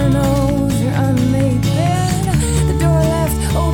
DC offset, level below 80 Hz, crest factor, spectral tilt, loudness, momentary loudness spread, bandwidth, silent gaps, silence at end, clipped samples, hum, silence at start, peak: under 0.1%; -24 dBFS; 12 dB; -6.5 dB/octave; -15 LUFS; 2 LU; 18.5 kHz; none; 0 s; under 0.1%; none; 0 s; -2 dBFS